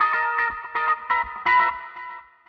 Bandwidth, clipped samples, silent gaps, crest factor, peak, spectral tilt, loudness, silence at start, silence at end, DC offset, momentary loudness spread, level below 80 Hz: 6.2 kHz; under 0.1%; none; 16 dB; -8 dBFS; -3.5 dB/octave; -22 LUFS; 0 s; 0.25 s; under 0.1%; 17 LU; -56 dBFS